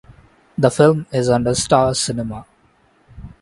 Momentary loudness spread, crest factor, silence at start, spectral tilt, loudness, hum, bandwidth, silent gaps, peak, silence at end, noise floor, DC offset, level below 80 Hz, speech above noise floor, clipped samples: 15 LU; 18 dB; 0.6 s; -5 dB/octave; -17 LUFS; none; 11.5 kHz; none; 0 dBFS; 0.15 s; -56 dBFS; under 0.1%; -44 dBFS; 40 dB; under 0.1%